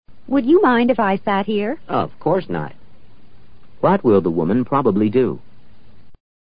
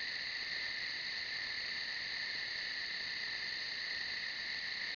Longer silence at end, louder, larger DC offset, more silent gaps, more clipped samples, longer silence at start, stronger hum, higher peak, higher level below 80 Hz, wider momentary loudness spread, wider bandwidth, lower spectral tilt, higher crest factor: first, 0.35 s vs 0.05 s; first, -18 LUFS vs -38 LUFS; first, 2% vs under 0.1%; neither; neither; about the same, 0.05 s vs 0 s; neither; first, -4 dBFS vs -28 dBFS; first, -50 dBFS vs -72 dBFS; first, 9 LU vs 1 LU; about the same, 5.2 kHz vs 5.4 kHz; first, -12 dB/octave vs 2.5 dB/octave; about the same, 16 dB vs 12 dB